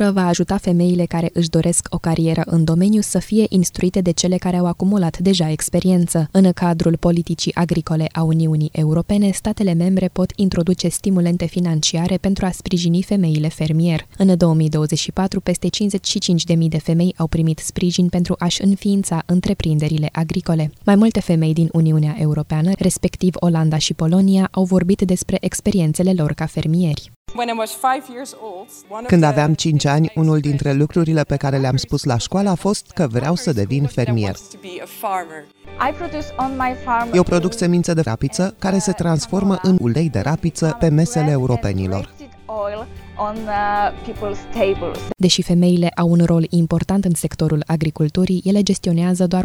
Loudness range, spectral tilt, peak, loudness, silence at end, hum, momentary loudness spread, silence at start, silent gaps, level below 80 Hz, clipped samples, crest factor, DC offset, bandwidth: 4 LU; -6 dB/octave; 0 dBFS; -18 LUFS; 0 s; none; 7 LU; 0 s; 27.16-27.25 s; -40 dBFS; under 0.1%; 16 dB; under 0.1%; 14.5 kHz